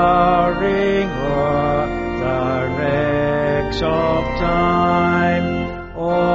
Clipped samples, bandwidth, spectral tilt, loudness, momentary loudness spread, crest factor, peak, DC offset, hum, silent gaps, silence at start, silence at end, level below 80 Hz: under 0.1%; 7.6 kHz; -5.5 dB/octave; -18 LUFS; 5 LU; 14 dB; -4 dBFS; under 0.1%; none; none; 0 s; 0 s; -32 dBFS